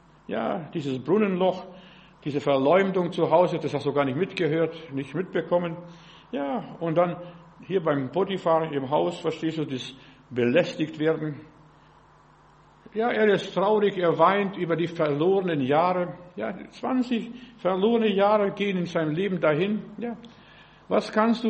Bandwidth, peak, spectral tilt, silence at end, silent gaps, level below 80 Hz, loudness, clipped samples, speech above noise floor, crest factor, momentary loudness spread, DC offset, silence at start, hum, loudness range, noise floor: 8.4 kHz; -6 dBFS; -7 dB/octave; 0 s; none; -64 dBFS; -25 LUFS; under 0.1%; 31 dB; 20 dB; 13 LU; under 0.1%; 0.3 s; none; 5 LU; -55 dBFS